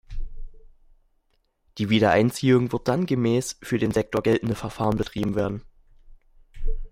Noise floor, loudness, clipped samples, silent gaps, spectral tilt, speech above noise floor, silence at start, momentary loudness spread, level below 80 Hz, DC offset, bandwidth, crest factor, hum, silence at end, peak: -68 dBFS; -23 LUFS; under 0.1%; none; -6 dB/octave; 46 dB; 0.1 s; 18 LU; -36 dBFS; under 0.1%; 16 kHz; 18 dB; none; 0.05 s; -6 dBFS